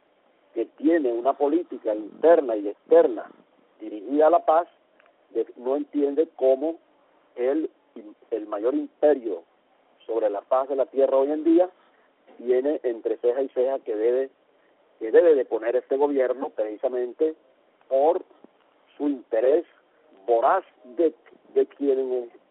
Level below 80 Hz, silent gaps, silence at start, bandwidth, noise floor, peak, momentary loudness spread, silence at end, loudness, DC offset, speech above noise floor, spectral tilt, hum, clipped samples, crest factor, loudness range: -76 dBFS; none; 0.55 s; 4 kHz; -63 dBFS; -6 dBFS; 13 LU; 0.25 s; -24 LUFS; under 0.1%; 40 dB; -3.5 dB/octave; none; under 0.1%; 18 dB; 4 LU